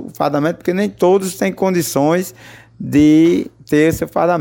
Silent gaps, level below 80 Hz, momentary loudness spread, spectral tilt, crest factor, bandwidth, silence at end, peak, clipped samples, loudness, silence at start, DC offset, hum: none; -46 dBFS; 8 LU; -6 dB/octave; 12 dB; 17 kHz; 0 s; -2 dBFS; under 0.1%; -15 LUFS; 0 s; under 0.1%; none